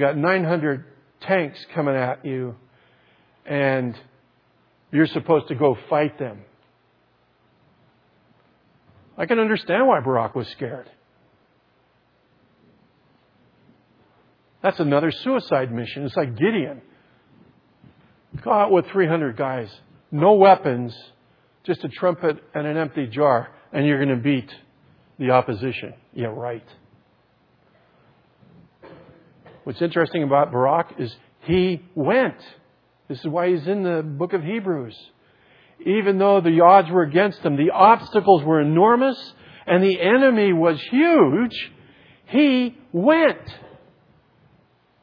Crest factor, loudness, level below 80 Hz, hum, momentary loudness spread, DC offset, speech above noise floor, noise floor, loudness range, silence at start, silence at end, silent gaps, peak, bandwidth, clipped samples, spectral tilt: 22 dB; -20 LUFS; -62 dBFS; none; 16 LU; under 0.1%; 43 dB; -62 dBFS; 10 LU; 0 s; 1.4 s; none; 0 dBFS; 5.2 kHz; under 0.1%; -9.5 dB/octave